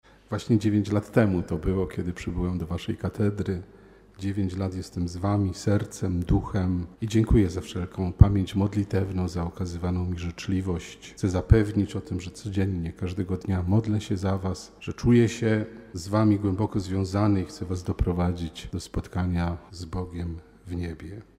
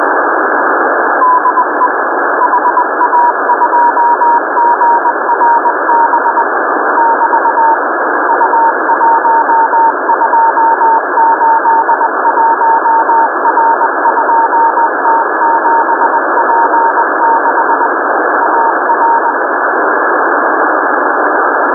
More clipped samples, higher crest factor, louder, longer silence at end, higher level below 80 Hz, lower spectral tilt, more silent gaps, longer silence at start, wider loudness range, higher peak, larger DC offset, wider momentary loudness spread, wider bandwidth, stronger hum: neither; first, 26 dB vs 10 dB; second, -27 LUFS vs -9 LUFS; first, 0.15 s vs 0 s; first, -36 dBFS vs -82 dBFS; second, -7.5 dB/octave vs -10.5 dB/octave; neither; first, 0.3 s vs 0 s; first, 5 LU vs 1 LU; about the same, 0 dBFS vs 0 dBFS; neither; first, 13 LU vs 3 LU; first, 12 kHz vs 1.9 kHz; neither